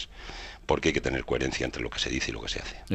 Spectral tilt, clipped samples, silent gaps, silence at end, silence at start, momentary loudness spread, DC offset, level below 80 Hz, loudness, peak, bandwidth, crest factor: -4 dB/octave; under 0.1%; none; 0 s; 0 s; 13 LU; under 0.1%; -42 dBFS; -30 LUFS; -6 dBFS; 11.5 kHz; 24 dB